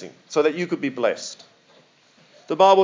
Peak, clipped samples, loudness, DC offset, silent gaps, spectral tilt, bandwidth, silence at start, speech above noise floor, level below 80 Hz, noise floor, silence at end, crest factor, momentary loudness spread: -2 dBFS; under 0.1%; -22 LUFS; under 0.1%; none; -4.5 dB/octave; 7.6 kHz; 0 s; 36 dB; -84 dBFS; -56 dBFS; 0 s; 20 dB; 15 LU